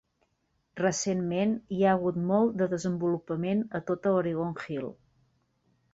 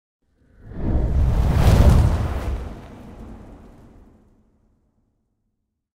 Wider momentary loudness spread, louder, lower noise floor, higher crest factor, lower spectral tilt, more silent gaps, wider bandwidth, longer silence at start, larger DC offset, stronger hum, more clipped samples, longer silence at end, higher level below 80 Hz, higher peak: second, 9 LU vs 25 LU; second, -29 LUFS vs -20 LUFS; about the same, -75 dBFS vs -75 dBFS; about the same, 18 dB vs 16 dB; second, -6 dB/octave vs -7.5 dB/octave; neither; second, 8 kHz vs 16 kHz; about the same, 0.75 s vs 0.65 s; neither; neither; neither; second, 1 s vs 2.45 s; second, -64 dBFS vs -24 dBFS; second, -12 dBFS vs -6 dBFS